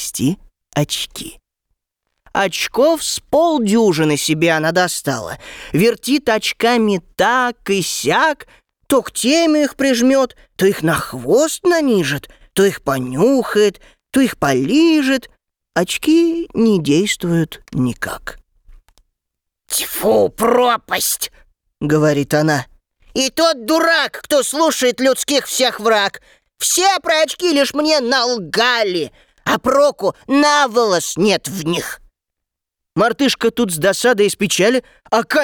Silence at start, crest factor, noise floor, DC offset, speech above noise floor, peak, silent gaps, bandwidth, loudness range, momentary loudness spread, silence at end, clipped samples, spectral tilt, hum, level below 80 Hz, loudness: 0 s; 12 dB; -81 dBFS; under 0.1%; 65 dB; -4 dBFS; none; over 20 kHz; 3 LU; 8 LU; 0 s; under 0.1%; -4 dB/octave; none; -50 dBFS; -16 LUFS